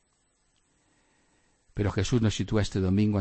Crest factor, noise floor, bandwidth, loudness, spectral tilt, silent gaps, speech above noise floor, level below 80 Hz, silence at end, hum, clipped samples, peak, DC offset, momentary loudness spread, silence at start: 18 dB; -71 dBFS; 8.8 kHz; -27 LUFS; -6.5 dB/octave; none; 45 dB; -46 dBFS; 0 s; none; under 0.1%; -12 dBFS; under 0.1%; 6 LU; 1.75 s